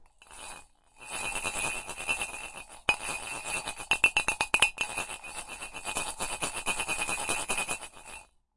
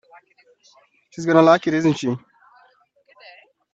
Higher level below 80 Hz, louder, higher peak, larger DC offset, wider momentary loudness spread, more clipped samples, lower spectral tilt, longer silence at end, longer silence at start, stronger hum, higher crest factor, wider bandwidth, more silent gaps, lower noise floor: first, -52 dBFS vs -66 dBFS; second, -30 LUFS vs -18 LUFS; second, -4 dBFS vs 0 dBFS; neither; about the same, 19 LU vs 17 LU; neither; second, -0.5 dB/octave vs -6.5 dB/octave; second, 0.3 s vs 1.55 s; second, 0 s vs 1.2 s; neither; first, 28 dB vs 22 dB; first, 11.5 kHz vs 7.8 kHz; neither; second, -53 dBFS vs -58 dBFS